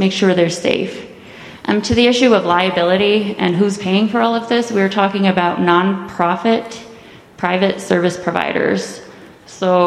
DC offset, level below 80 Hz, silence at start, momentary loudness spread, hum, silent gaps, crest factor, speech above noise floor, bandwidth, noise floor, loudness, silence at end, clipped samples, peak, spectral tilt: under 0.1%; -50 dBFS; 0 s; 13 LU; none; none; 16 dB; 25 dB; 12 kHz; -40 dBFS; -15 LUFS; 0 s; under 0.1%; 0 dBFS; -5.5 dB/octave